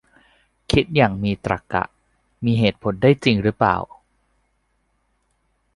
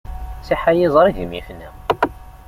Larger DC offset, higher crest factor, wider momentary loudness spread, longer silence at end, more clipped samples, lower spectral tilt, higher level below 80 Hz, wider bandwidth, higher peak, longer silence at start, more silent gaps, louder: neither; about the same, 20 dB vs 18 dB; second, 8 LU vs 19 LU; first, 1.9 s vs 0.1 s; neither; about the same, -7 dB/octave vs -7 dB/octave; second, -44 dBFS vs -34 dBFS; second, 11.5 kHz vs 16 kHz; about the same, -2 dBFS vs -2 dBFS; first, 0.7 s vs 0.05 s; neither; about the same, -20 LUFS vs -18 LUFS